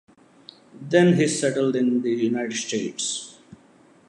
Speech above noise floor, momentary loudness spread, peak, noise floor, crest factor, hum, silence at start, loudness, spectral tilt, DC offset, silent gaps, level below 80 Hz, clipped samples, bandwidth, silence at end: 33 dB; 11 LU; -4 dBFS; -54 dBFS; 20 dB; none; 0.75 s; -22 LUFS; -5 dB/octave; under 0.1%; none; -72 dBFS; under 0.1%; 11.5 kHz; 0.55 s